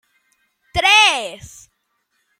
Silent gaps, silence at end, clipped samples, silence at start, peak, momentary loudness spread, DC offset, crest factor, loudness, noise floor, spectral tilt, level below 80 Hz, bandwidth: none; 0.95 s; under 0.1%; 0.75 s; 0 dBFS; 21 LU; under 0.1%; 20 dB; -13 LUFS; -69 dBFS; -0.5 dB/octave; -46 dBFS; 16 kHz